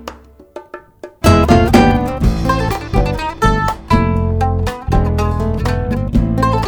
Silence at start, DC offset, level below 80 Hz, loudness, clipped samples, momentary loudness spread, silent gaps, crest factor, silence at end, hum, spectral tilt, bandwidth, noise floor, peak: 0 s; under 0.1%; -22 dBFS; -15 LUFS; under 0.1%; 8 LU; none; 14 dB; 0 s; none; -7 dB/octave; 19.5 kHz; -36 dBFS; 0 dBFS